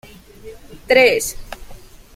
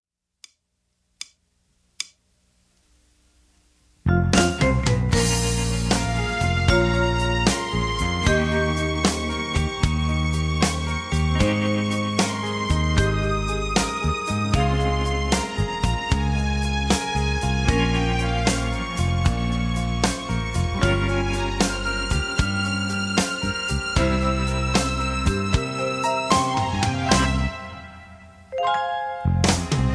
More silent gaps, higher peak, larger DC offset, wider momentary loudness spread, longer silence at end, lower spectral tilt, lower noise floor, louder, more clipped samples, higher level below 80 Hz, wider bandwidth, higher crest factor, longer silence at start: neither; about the same, -2 dBFS vs -2 dBFS; neither; first, 24 LU vs 5 LU; first, 0.4 s vs 0 s; second, -2 dB/octave vs -5 dB/octave; second, -39 dBFS vs -73 dBFS; first, -15 LUFS vs -22 LUFS; neither; second, -42 dBFS vs -30 dBFS; first, 16.5 kHz vs 11 kHz; about the same, 18 dB vs 20 dB; second, 0.45 s vs 1.2 s